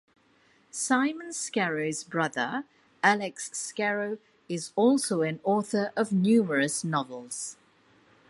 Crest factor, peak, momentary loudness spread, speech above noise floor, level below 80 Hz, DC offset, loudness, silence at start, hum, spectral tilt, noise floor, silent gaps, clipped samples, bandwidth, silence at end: 20 dB; -8 dBFS; 12 LU; 36 dB; -76 dBFS; under 0.1%; -28 LUFS; 0.75 s; none; -4.5 dB/octave; -64 dBFS; none; under 0.1%; 11.5 kHz; 0.75 s